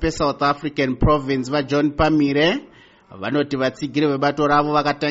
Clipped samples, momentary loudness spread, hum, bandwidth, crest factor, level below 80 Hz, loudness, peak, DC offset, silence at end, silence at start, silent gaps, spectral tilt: under 0.1%; 6 LU; none; 8 kHz; 14 dB; -36 dBFS; -19 LUFS; -6 dBFS; under 0.1%; 0 s; 0 s; none; -4.5 dB/octave